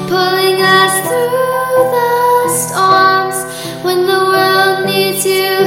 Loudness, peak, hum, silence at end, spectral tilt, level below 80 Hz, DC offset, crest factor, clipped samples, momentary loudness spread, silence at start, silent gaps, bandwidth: -11 LUFS; 0 dBFS; none; 0 s; -3 dB/octave; -56 dBFS; 0.1%; 12 dB; under 0.1%; 6 LU; 0 s; none; 17 kHz